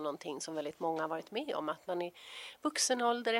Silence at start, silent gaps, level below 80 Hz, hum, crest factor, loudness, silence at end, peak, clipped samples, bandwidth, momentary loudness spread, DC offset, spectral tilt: 0 s; none; -84 dBFS; none; 18 dB; -36 LUFS; 0 s; -18 dBFS; under 0.1%; 16 kHz; 11 LU; under 0.1%; -2 dB/octave